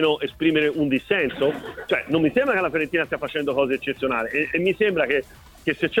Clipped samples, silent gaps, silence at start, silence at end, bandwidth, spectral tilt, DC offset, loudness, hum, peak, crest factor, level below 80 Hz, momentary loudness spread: under 0.1%; none; 0 s; 0 s; 16.5 kHz; -6.5 dB/octave; under 0.1%; -22 LUFS; none; -6 dBFS; 16 dB; -52 dBFS; 5 LU